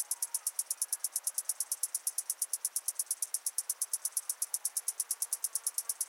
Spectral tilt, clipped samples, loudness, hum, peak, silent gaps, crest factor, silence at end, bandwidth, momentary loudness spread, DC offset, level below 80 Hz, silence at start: 7 dB/octave; under 0.1%; -34 LUFS; none; -14 dBFS; none; 22 dB; 0 s; 17 kHz; 1 LU; under 0.1%; under -90 dBFS; 0 s